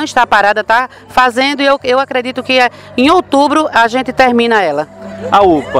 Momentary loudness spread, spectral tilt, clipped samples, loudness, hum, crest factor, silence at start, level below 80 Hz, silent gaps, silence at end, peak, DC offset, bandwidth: 7 LU; -4 dB/octave; 0.2%; -11 LUFS; none; 12 dB; 0 s; -44 dBFS; none; 0 s; 0 dBFS; under 0.1%; 15.5 kHz